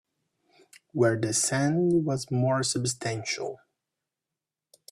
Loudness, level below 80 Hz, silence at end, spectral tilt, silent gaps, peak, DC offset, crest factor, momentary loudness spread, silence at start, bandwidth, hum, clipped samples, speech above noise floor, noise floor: -26 LUFS; -66 dBFS; 1.35 s; -4.5 dB/octave; none; -10 dBFS; under 0.1%; 18 dB; 8 LU; 0.95 s; 13.5 kHz; none; under 0.1%; 62 dB; -89 dBFS